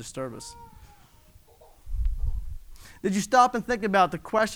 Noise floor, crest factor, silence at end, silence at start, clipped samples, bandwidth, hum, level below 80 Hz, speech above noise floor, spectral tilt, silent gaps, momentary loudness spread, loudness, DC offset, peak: -55 dBFS; 20 dB; 0 s; 0 s; under 0.1%; over 20 kHz; none; -36 dBFS; 30 dB; -4.5 dB/octave; none; 21 LU; -26 LUFS; under 0.1%; -6 dBFS